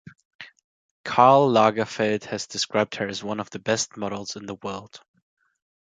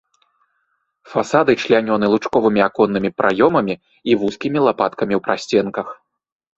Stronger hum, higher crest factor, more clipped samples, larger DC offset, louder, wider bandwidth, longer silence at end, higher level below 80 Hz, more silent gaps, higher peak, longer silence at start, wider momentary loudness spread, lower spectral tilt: neither; first, 24 dB vs 18 dB; neither; neither; second, -23 LUFS vs -17 LUFS; first, 9.6 kHz vs 8 kHz; first, 0.95 s vs 0.65 s; second, -64 dBFS vs -56 dBFS; first, 0.64-1.04 s vs none; about the same, -2 dBFS vs 0 dBFS; second, 0.4 s vs 1.1 s; first, 17 LU vs 9 LU; second, -4 dB/octave vs -6 dB/octave